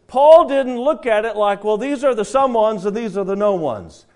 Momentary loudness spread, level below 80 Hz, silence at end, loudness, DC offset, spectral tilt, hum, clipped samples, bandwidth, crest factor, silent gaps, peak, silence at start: 12 LU; -52 dBFS; 0.25 s; -16 LUFS; under 0.1%; -5.5 dB/octave; none; 0.1%; 10.5 kHz; 16 dB; none; 0 dBFS; 0.1 s